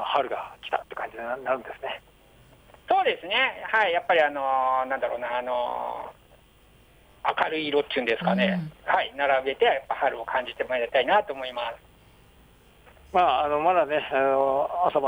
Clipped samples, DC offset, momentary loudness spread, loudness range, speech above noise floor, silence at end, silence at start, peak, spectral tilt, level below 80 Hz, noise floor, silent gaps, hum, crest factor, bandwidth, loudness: under 0.1%; under 0.1%; 11 LU; 4 LU; 31 dB; 0 s; 0 s; -10 dBFS; -6 dB/octave; -60 dBFS; -56 dBFS; none; none; 16 dB; over 20 kHz; -25 LUFS